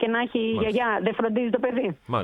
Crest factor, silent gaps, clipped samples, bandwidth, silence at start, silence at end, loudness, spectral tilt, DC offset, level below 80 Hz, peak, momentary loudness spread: 16 dB; none; under 0.1%; 8 kHz; 0 s; 0 s; -25 LUFS; -7.5 dB/octave; under 0.1%; -56 dBFS; -8 dBFS; 3 LU